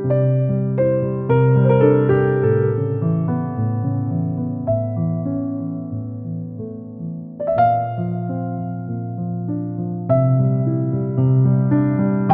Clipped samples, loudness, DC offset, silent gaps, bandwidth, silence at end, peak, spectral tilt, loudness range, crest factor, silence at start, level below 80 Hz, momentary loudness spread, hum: under 0.1%; -19 LUFS; under 0.1%; none; 3.5 kHz; 0 s; -2 dBFS; -13.5 dB/octave; 6 LU; 16 dB; 0 s; -50 dBFS; 13 LU; none